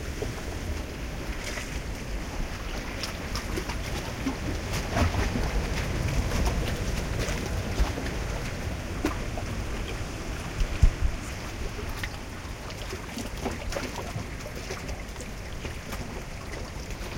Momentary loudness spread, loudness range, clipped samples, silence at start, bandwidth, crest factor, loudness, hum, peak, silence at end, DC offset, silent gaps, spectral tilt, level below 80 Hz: 9 LU; 6 LU; under 0.1%; 0 s; 17 kHz; 22 dB; -32 LUFS; none; -8 dBFS; 0 s; under 0.1%; none; -5 dB/octave; -34 dBFS